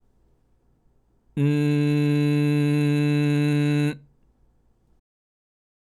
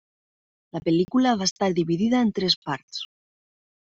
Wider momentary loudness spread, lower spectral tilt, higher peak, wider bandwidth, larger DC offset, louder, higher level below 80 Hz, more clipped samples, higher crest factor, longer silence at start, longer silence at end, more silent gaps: second, 5 LU vs 14 LU; first, -8 dB/octave vs -4.5 dB/octave; about the same, -10 dBFS vs -8 dBFS; first, 12.5 kHz vs 8 kHz; neither; about the same, -22 LUFS vs -23 LUFS; about the same, -64 dBFS vs -62 dBFS; neither; about the same, 14 dB vs 18 dB; first, 1.35 s vs 0.75 s; first, 2 s vs 0.75 s; second, none vs 1.51-1.56 s, 2.56-2.62 s, 2.83-2.88 s